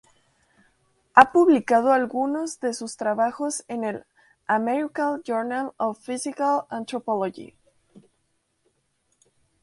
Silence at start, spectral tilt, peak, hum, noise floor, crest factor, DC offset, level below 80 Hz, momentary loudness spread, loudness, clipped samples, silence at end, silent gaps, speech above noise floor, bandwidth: 1.15 s; -4 dB/octave; 0 dBFS; none; -72 dBFS; 24 dB; under 0.1%; -70 dBFS; 14 LU; -23 LUFS; under 0.1%; 1.65 s; none; 49 dB; 11.5 kHz